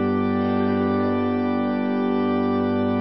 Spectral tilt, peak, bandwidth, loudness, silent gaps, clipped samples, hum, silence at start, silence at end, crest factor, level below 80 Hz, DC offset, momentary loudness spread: -12 dB/octave; -10 dBFS; 5.6 kHz; -22 LUFS; none; under 0.1%; none; 0 s; 0 s; 10 dB; -48 dBFS; 0.3%; 1 LU